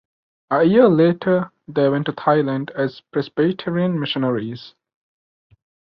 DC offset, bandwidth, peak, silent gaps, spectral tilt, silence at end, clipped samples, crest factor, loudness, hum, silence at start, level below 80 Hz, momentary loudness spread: under 0.1%; 5.8 kHz; -2 dBFS; none; -9.5 dB/octave; 1.3 s; under 0.1%; 18 dB; -19 LUFS; none; 0.5 s; -62 dBFS; 12 LU